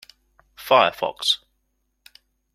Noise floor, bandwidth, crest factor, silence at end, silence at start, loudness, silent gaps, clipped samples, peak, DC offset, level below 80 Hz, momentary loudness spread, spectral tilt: -72 dBFS; 16 kHz; 22 dB; 1.2 s; 0.6 s; -20 LUFS; none; under 0.1%; -2 dBFS; under 0.1%; -64 dBFS; 7 LU; -2 dB/octave